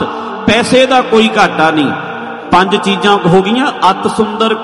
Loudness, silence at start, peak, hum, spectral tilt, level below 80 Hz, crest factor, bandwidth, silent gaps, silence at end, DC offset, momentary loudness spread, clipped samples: -10 LUFS; 0 s; 0 dBFS; none; -5 dB/octave; -44 dBFS; 10 dB; 11.5 kHz; none; 0 s; under 0.1%; 8 LU; 0.1%